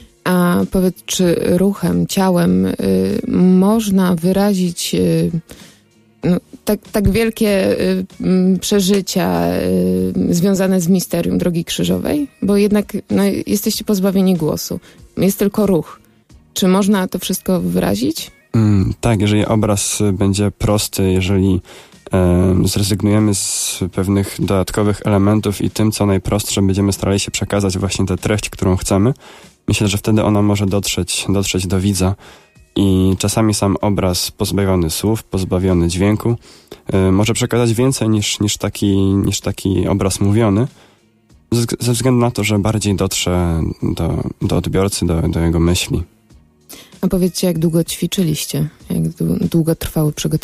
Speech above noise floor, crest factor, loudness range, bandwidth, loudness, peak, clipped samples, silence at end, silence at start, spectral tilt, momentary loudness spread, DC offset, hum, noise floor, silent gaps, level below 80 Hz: 36 dB; 12 dB; 2 LU; 15.5 kHz; -16 LUFS; -4 dBFS; under 0.1%; 0.05 s; 0 s; -5.5 dB/octave; 6 LU; under 0.1%; none; -51 dBFS; none; -36 dBFS